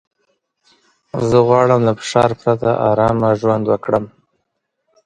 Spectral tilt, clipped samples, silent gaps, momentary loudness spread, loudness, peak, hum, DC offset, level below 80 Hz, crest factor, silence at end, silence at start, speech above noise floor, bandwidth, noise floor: -7 dB/octave; under 0.1%; none; 8 LU; -15 LUFS; 0 dBFS; none; under 0.1%; -48 dBFS; 16 dB; 1 s; 1.15 s; 58 dB; 9.6 kHz; -72 dBFS